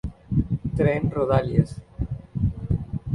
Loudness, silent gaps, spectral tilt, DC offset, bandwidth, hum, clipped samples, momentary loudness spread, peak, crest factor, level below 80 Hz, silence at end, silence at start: -25 LUFS; none; -9.5 dB/octave; under 0.1%; 11 kHz; none; under 0.1%; 10 LU; -4 dBFS; 20 dB; -36 dBFS; 0 s; 0.05 s